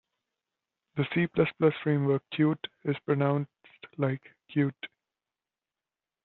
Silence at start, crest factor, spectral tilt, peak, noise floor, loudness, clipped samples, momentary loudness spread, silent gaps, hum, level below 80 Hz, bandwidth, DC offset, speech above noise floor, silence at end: 0.95 s; 20 dB; -6.5 dB/octave; -10 dBFS; under -90 dBFS; -29 LUFS; under 0.1%; 13 LU; none; none; -68 dBFS; 4.3 kHz; under 0.1%; over 62 dB; 1.4 s